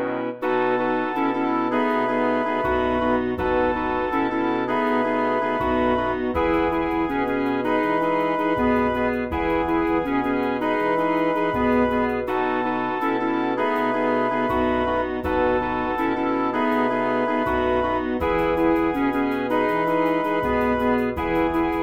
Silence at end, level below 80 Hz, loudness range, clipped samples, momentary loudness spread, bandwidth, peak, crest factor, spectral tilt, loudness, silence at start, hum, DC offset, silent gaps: 0 s; -42 dBFS; 1 LU; under 0.1%; 3 LU; 15.5 kHz; -8 dBFS; 14 dB; -7.5 dB/octave; -22 LUFS; 0 s; none; 0.4%; none